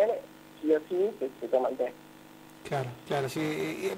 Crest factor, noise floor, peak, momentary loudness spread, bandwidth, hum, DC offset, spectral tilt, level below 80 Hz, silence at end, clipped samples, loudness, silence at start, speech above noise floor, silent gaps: 18 dB; -51 dBFS; -14 dBFS; 22 LU; 16 kHz; none; under 0.1%; -6 dB/octave; -70 dBFS; 0 s; under 0.1%; -31 LUFS; 0 s; 20 dB; none